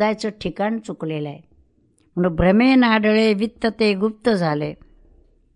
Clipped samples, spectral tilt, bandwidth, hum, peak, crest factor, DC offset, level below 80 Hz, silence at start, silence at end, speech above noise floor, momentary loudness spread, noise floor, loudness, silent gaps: under 0.1%; -7 dB/octave; 11 kHz; none; -4 dBFS; 16 dB; under 0.1%; -44 dBFS; 0 s; 0.8 s; 41 dB; 13 LU; -60 dBFS; -19 LUFS; none